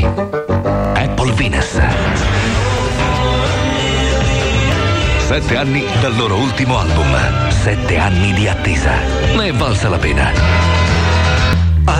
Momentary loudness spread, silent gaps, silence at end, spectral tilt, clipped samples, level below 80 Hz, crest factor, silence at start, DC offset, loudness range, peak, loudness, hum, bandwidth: 3 LU; none; 0 s; -5.5 dB/octave; under 0.1%; -20 dBFS; 12 dB; 0 s; under 0.1%; 1 LU; 0 dBFS; -14 LUFS; none; 10.5 kHz